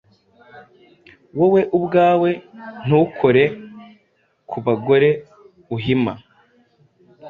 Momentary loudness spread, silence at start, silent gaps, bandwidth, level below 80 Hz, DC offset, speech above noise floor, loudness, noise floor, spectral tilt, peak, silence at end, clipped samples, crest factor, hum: 17 LU; 0.55 s; none; 4.9 kHz; -58 dBFS; under 0.1%; 46 dB; -18 LUFS; -63 dBFS; -9.5 dB/octave; -2 dBFS; 0 s; under 0.1%; 18 dB; none